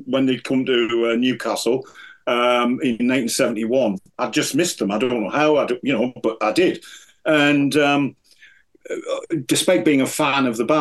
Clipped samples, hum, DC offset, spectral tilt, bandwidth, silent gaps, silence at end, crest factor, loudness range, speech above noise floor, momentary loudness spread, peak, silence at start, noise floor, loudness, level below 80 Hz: under 0.1%; none; under 0.1%; -4 dB/octave; 12.5 kHz; none; 0 s; 16 dB; 1 LU; 33 dB; 9 LU; -4 dBFS; 0 s; -52 dBFS; -19 LUFS; -64 dBFS